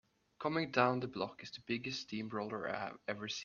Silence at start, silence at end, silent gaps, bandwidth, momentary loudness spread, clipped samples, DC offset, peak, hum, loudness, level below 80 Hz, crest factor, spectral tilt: 0.4 s; 0 s; none; 7.4 kHz; 10 LU; under 0.1%; under 0.1%; -14 dBFS; none; -38 LUFS; -76 dBFS; 26 dB; -5 dB/octave